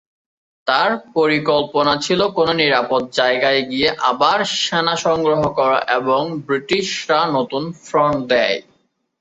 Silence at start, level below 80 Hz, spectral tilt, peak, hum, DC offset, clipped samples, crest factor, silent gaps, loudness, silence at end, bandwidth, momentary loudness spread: 0.65 s; -54 dBFS; -4 dB/octave; 0 dBFS; none; under 0.1%; under 0.1%; 16 dB; none; -17 LUFS; 0.6 s; 8.2 kHz; 5 LU